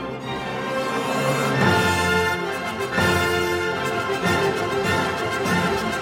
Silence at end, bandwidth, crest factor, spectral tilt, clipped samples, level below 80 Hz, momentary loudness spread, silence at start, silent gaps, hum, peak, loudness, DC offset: 0 s; 17 kHz; 16 dB; -4.5 dB/octave; under 0.1%; -48 dBFS; 7 LU; 0 s; none; none; -6 dBFS; -22 LUFS; under 0.1%